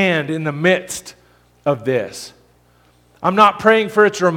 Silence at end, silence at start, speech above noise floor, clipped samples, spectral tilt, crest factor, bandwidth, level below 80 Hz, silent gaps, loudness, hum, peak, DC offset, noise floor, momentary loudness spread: 0 s; 0 s; 38 dB; under 0.1%; -5 dB/octave; 18 dB; 17 kHz; -58 dBFS; none; -16 LUFS; 60 Hz at -50 dBFS; 0 dBFS; under 0.1%; -54 dBFS; 17 LU